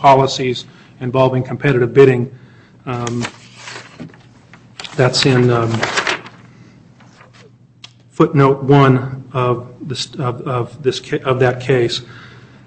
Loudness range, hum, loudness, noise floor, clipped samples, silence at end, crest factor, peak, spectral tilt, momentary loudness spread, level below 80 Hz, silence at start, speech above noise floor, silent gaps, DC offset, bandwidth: 3 LU; none; -16 LUFS; -45 dBFS; under 0.1%; 0.4 s; 16 dB; 0 dBFS; -6 dB/octave; 21 LU; -50 dBFS; 0 s; 31 dB; none; under 0.1%; 8.6 kHz